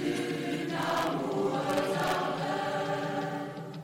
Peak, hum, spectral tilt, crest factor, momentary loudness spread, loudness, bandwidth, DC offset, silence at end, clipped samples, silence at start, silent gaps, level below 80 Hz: -18 dBFS; none; -5 dB/octave; 14 dB; 4 LU; -31 LUFS; 16.5 kHz; under 0.1%; 0 s; under 0.1%; 0 s; none; -66 dBFS